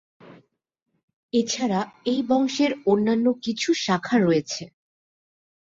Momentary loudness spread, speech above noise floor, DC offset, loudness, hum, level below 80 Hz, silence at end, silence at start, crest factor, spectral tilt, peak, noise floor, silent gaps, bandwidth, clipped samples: 6 LU; 35 dB; under 0.1%; -23 LUFS; none; -66 dBFS; 1 s; 0.25 s; 16 dB; -4.5 dB/octave; -8 dBFS; -57 dBFS; 0.82-0.86 s, 1.03-1.08 s, 1.16-1.29 s; 7.8 kHz; under 0.1%